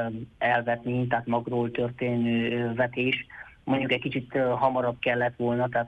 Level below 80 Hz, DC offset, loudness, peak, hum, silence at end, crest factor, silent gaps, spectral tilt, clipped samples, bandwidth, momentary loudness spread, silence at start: -60 dBFS; under 0.1%; -27 LUFS; -10 dBFS; none; 0 s; 16 dB; none; -8.5 dB/octave; under 0.1%; 4.9 kHz; 5 LU; 0 s